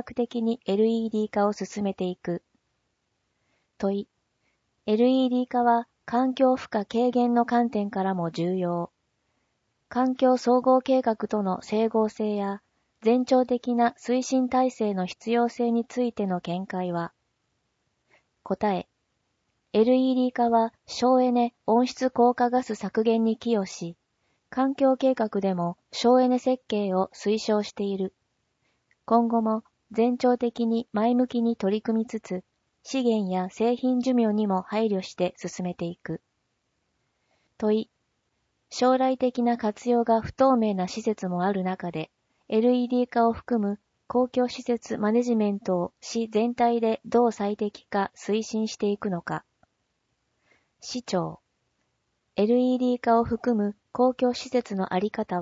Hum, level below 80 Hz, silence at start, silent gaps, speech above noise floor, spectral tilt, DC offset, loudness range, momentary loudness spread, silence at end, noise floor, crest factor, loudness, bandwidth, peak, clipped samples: none; -64 dBFS; 0.05 s; none; 51 dB; -6.5 dB/octave; under 0.1%; 7 LU; 10 LU; 0 s; -76 dBFS; 16 dB; -25 LUFS; 7.8 kHz; -8 dBFS; under 0.1%